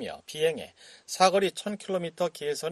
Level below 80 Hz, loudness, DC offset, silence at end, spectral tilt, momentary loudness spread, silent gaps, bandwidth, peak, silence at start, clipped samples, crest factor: -70 dBFS; -28 LUFS; under 0.1%; 0 s; -3.5 dB/octave; 15 LU; none; 13 kHz; -6 dBFS; 0 s; under 0.1%; 22 dB